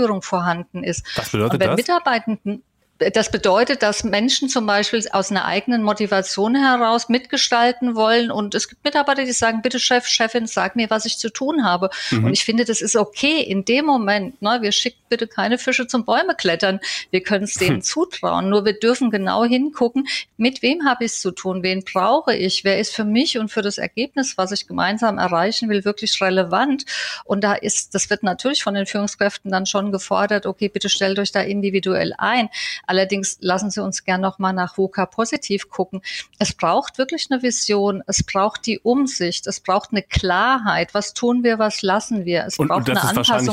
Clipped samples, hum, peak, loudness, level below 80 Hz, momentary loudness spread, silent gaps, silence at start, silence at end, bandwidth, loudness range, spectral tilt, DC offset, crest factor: under 0.1%; none; -6 dBFS; -19 LUFS; -50 dBFS; 6 LU; none; 0 s; 0 s; 16 kHz; 3 LU; -3.5 dB/octave; under 0.1%; 14 dB